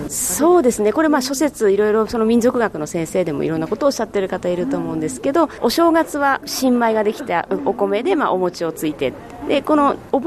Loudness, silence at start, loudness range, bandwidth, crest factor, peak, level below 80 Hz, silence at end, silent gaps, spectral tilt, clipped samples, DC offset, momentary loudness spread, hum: -18 LUFS; 0 s; 3 LU; 13.5 kHz; 14 dB; -4 dBFS; -48 dBFS; 0 s; none; -4.5 dB/octave; under 0.1%; under 0.1%; 7 LU; none